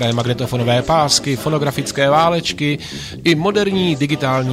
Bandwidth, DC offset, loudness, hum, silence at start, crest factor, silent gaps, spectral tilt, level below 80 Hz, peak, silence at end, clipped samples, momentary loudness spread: 16 kHz; under 0.1%; -16 LUFS; none; 0 s; 14 dB; none; -4.5 dB/octave; -44 dBFS; -2 dBFS; 0 s; under 0.1%; 6 LU